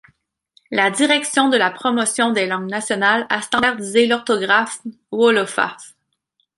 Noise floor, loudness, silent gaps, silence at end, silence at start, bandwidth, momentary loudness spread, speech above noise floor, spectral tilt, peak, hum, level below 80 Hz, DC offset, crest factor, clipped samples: -69 dBFS; -17 LUFS; none; 0.7 s; 0.7 s; 11.5 kHz; 7 LU; 51 dB; -2.5 dB/octave; -2 dBFS; none; -62 dBFS; under 0.1%; 18 dB; under 0.1%